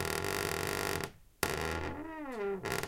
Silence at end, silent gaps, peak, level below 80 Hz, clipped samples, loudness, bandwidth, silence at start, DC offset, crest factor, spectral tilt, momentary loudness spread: 0 s; none; -10 dBFS; -52 dBFS; under 0.1%; -36 LUFS; 16.5 kHz; 0 s; under 0.1%; 28 dB; -3.5 dB/octave; 8 LU